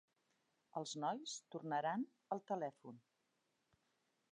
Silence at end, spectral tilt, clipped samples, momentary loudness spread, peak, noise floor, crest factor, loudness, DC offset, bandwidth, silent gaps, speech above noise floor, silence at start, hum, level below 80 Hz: 1.3 s; -4 dB/octave; under 0.1%; 14 LU; -28 dBFS; -85 dBFS; 18 dB; -45 LUFS; under 0.1%; 10 kHz; none; 40 dB; 0.75 s; none; under -90 dBFS